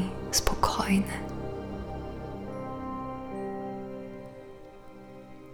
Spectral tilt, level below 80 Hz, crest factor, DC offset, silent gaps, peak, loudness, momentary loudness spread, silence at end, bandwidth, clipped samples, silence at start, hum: -4 dB/octave; -44 dBFS; 28 dB; under 0.1%; none; -4 dBFS; -32 LUFS; 21 LU; 0 s; over 20 kHz; under 0.1%; 0 s; none